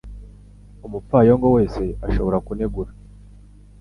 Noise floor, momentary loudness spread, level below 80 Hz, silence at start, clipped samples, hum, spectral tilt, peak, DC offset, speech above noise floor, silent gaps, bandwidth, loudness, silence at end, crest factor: -45 dBFS; 20 LU; -32 dBFS; 0.05 s; under 0.1%; 50 Hz at -30 dBFS; -10 dB/octave; -2 dBFS; under 0.1%; 26 dB; none; 10.5 kHz; -19 LUFS; 0.9 s; 18 dB